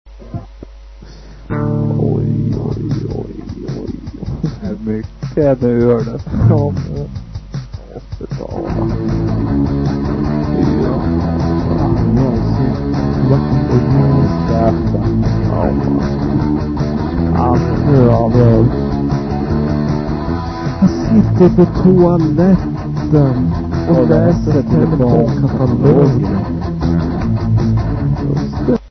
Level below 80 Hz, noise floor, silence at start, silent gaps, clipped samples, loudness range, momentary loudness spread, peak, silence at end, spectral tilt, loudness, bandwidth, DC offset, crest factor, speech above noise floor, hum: -26 dBFS; -34 dBFS; 0.05 s; none; under 0.1%; 7 LU; 13 LU; 0 dBFS; 0 s; -9.5 dB/octave; -14 LUFS; 6.4 kHz; under 0.1%; 14 dB; 23 dB; none